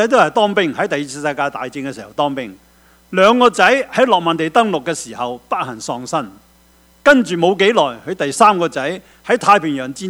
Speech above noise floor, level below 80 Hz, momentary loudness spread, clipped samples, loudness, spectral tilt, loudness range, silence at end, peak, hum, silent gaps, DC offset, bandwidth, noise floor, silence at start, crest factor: 35 dB; -54 dBFS; 13 LU; under 0.1%; -15 LUFS; -4 dB/octave; 4 LU; 0 s; 0 dBFS; none; none; under 0.1%; 17 kHz; -51 dBFS; 0 s; 16 dB